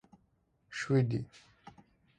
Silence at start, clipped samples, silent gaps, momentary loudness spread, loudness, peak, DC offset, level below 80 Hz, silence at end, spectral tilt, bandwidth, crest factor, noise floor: 0.7 s; under 0.1%; none; 20 LU; -33 LUFS; -16 dBFS; under 0.1%; -66 dBFS; 0.95 s; -7 dB/octave; 9.6 kHz; 20 dB; -73 dBFS